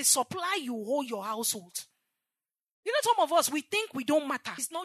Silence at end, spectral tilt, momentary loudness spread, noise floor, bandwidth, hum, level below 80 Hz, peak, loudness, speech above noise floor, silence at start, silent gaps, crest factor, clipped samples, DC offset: 0 s; -1.5 dB/octave; 10 LU; under -90 dBFS; 13.5 kHz; none; -88 dBFS; -10 dBFS; -29 LUFS; over 60 dB; 0 s; 2.71-2.83 s; 20 dB; under 0.1%; under 0.1%